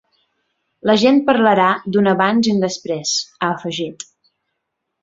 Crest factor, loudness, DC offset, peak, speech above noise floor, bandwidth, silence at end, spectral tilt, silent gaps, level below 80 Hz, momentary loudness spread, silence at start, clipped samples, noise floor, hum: 16 dB; -16 LUFS; under 0.1%; -2 dBFS; 60 dB; 7.8 kHz; 1 s; -4.5 dB/octave; none; -60 dBFS; 12 LU; 0.85 s; under 0.1%; -76 dBFS; none